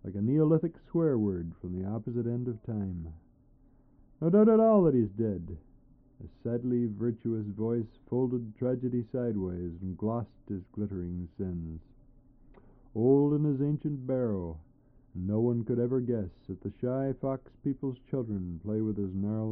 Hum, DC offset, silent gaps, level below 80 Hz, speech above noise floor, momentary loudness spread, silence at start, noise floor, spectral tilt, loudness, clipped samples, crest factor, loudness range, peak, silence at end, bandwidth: none; under 0.1%; none; -56 dBFS; 31 dB; 15 LU; 0.05 s; -61 dBFS; -12 dB/octave; -31 LUFS; under 0.1%; 18 dB; 7 LU; -12 dBFS; 0 s; 3.3 kHz